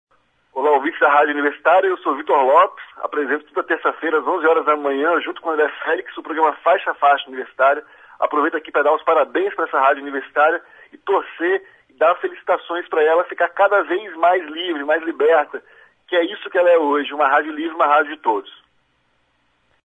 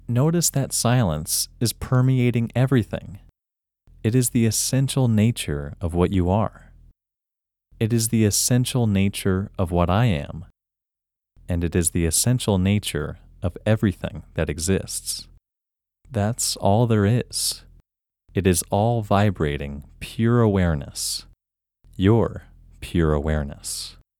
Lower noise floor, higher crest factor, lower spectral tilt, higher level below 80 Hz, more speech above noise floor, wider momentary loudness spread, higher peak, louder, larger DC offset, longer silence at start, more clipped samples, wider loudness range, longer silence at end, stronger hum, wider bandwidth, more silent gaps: second, -64 dBFS vs -87 dBFS; about the same, 16 dB vs 18 dB; about the same, -4.5 dB/octave vs -5 dB/octave; second, -72 dBFS vs -40 dBFS; second, 46 dB vs 66 dB; second, 8 LU vs 11 LU; about the same, -2 dBFS vs -4 dBFS; first, -18 LUFS vs -22 LUFS; neither; first, 0.55 s vs 0.1 s; neither; about the same, 2 LU vs 3 LU; first, 1.4 s vs 0.3 s; neither; second, 7.6 kHz vs 19 kHz; neither